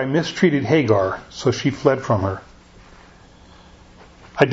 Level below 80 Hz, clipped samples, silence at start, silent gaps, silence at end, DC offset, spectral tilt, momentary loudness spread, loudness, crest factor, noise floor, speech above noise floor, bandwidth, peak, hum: -50 dBFS; under 0.1%; 0 s; none; 0 s; under 0.1%; -6.5 dB/octave; 9 LU; -19 LUFS; 20 dB; -47 dBFS; 28 dB; 8 kHz; 0 dBFS; none